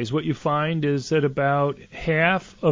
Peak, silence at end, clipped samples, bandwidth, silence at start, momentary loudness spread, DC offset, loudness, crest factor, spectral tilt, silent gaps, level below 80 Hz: -6 dBFS; 0 s; under 0.1%; 7.6 kHz; 0 s; 5 LU; under 0.1%; -23 LUFS; 16 dB; -6.5 dB/octave; none; -52 dBFS